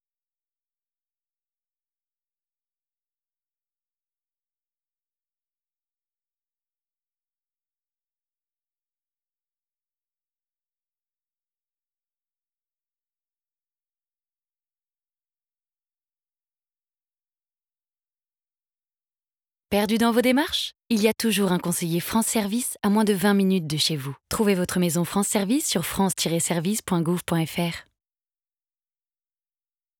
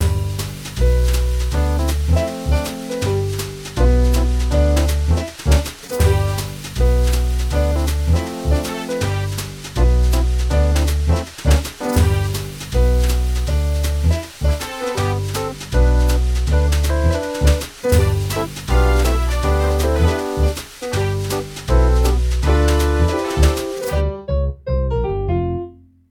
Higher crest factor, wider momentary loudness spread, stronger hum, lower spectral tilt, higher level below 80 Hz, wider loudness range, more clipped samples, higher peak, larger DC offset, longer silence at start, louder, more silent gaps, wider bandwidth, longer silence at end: about the same, 20 dB vs 16 dB; about the same, 6 LU vs 7 LU; neither; second, -4.5 dB/octave vs -6 dB/octave; second, -60 dBFS vs -18 dBFS; first, 5 LU vs 2 LU; neither; second, -10 dBFS vs -2 dBFS; neither; first, 19.7 s vs 0 s; second, -23 LUFS vs -19 LUFS; neither; first, over 20 kHz vs 17 kHz; first, 2.2 s vs 0.4 s